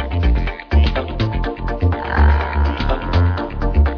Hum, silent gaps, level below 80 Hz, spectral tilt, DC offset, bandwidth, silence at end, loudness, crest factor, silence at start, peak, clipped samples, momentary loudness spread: none; none; -18 dBFS; -8.5 dB/octave; under 0.1%; 5.4 kHz; 0 s; -19 LUFS; 14 dB; 0 s; -2 dBFS; under 0.1%; 6 LU